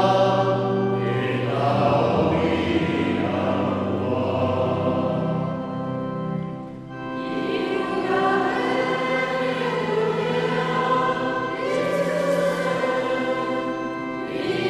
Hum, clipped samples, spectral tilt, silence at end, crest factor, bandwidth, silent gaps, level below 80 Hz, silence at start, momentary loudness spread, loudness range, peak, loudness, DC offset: none; under 0.1%; -6.5 dB/octave; 0 s; 16 dB; 13.5 kHz; none; -54 dBFS; 0 s; 8 LU; 4 LU; -6 dBFS; -23 LUFS; under 0.1%